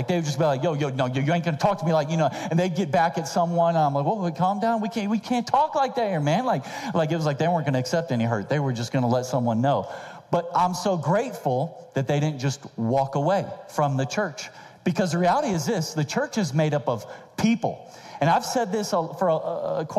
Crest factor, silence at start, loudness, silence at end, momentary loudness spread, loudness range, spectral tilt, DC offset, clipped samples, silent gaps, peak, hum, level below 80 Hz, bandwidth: 18 dB; 0 s; -24 LUFS; 0 s; 6 LU; 2 LU; -6 dB/octave; under 0.1%; under 0.1%; none; -6 dBFS; none; -64 dBFS; 14.5 kHz